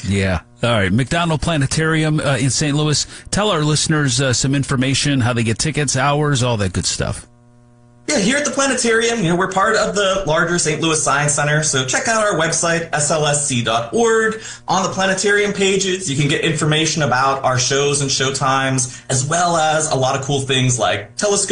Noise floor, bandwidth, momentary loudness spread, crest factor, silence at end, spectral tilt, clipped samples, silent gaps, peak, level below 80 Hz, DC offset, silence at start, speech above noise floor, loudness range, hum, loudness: -48 dBFS; 10.5 kHz; 4 LU; 12 dB; 0 s; -3.5 dB/octave; under 0.1%; none; -4 dBFS; -40 dBFS; under 0.1%; 0 s; 31 dB; 2 LU; none; -16 LUFS